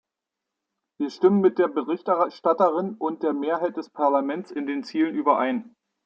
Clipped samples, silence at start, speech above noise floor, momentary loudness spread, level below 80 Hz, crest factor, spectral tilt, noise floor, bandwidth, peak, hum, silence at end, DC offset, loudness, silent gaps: under 0.1%; 1 s; 62 dB; 9 LU; -78 dBFS; 18 dB; -8 dB/octave; -85 dBFS; 7.2 kHz; -6 dBFS; none; 0.4 s; under 0.1%; -24 LUFS; none